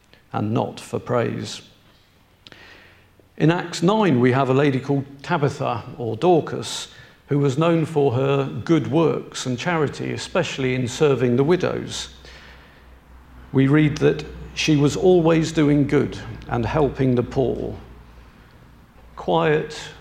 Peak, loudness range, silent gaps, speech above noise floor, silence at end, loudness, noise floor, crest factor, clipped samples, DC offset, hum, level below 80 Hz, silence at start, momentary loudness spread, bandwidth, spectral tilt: -2 dBFS; 5 LU; none; 35 dB; 0 s; -21 LUFS; -55 dBFS; 18 dB; under 0.1%; under 0.1%; none; -46 dBFS; 0.35 s; 12 LU; 13.5 kHz; -6.5 dB/octave